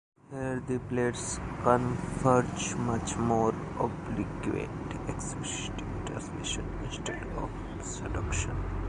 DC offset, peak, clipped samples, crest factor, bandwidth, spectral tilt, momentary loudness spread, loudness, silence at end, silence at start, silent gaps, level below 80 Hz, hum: under 0.1%; -8 dBFS; under 0.1%; 24 dB; 11 kHz; -5 dB/octave; 10 LU; -32 LUFS; 0 s; 0.3 s; none; -42 dBFS; none